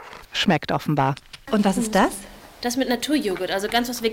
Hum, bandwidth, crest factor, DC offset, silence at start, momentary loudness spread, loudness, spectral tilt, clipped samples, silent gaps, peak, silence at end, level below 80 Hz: none; 17 kHz; 18 dB; under 0.1%; 0 s; 9 LU; -22 LUFS; -4.5 dB/octave; under 0.1%; none; -6 dBFS; 0 s; -48 dBFS